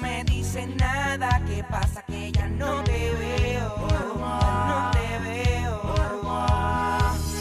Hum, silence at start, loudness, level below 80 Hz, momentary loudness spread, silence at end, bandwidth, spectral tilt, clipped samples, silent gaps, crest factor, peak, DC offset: none; 0 s; -25 LUFS; -30 dBFS; 4 LU; 0 s; 15 kHz; -5.5 dB/octave; under 0.1%; none; 16 dB; -8 dBFS; under 0.1%